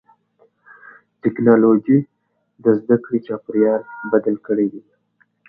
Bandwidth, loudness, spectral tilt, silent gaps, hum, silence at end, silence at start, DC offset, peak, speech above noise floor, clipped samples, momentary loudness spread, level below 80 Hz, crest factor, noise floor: 3.4 kHz; -18 LUFS; -12.5 dB/octave; none; none; 0.7 s; 1.25 s; under 0.1%; 0 dBFS; 46 dB; under 0.1%; 10 LU; -68 dBFS; 18 dB; -63 dBFS